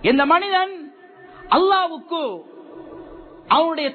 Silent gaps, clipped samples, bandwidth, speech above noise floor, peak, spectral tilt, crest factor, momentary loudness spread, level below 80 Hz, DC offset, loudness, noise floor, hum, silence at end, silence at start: none; under 0.1%; 4.6 kHz; 26 dB; -4 dBFS; -7 dB/octave; 16 dB; 23 LU; -54 dBFS; under 0.1%; -19 LUFS; -44 dBFS; none; 0 s; 0 s